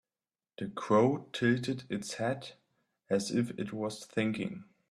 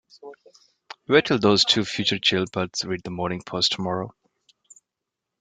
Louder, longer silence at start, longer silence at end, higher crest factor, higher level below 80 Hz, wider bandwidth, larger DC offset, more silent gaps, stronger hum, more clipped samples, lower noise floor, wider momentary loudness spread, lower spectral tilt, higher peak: second, -33 LUFS vs -22 LUFS; first, 0.6 s vs 0.25 s; second, 0.3 s vs 1.3 s; about the same, 20 dB vs 22 dB; second, -72 dBFS vs -60 dBFS; first, 13 kHz vs 9.6 kHz; neither; neither; neither; neither; first, under -90 dBFS vs -85 dBFS; first, 14 LU vs 11 LU; first, -5.5 dB/octave vs -4 dB/octave; second, -14 dBFS vs -4 dBFS